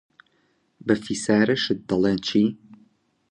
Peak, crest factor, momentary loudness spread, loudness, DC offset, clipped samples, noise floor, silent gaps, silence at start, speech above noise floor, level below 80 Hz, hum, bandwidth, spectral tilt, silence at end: -6 dBFS; 18 dB; 5 LU; -23 LUFS; under 0.1%; under 0.1%; -67 dBFS; none; 0.85 s; 45 dB; -58 dBFS; none; 10.5 kHz; -5 dB/octave; 0.55 s